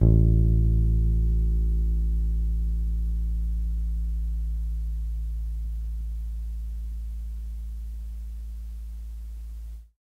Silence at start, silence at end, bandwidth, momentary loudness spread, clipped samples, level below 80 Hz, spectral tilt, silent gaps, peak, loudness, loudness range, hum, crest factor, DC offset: 0 s; 0.15 s; 0.9 kHz; 16 LU; under 0.1%; -26 dBFS; -10.5 dB/octave; none; -6 dBFS; -28 LUFS; 11 LU; none; 18 dB; under 0.1%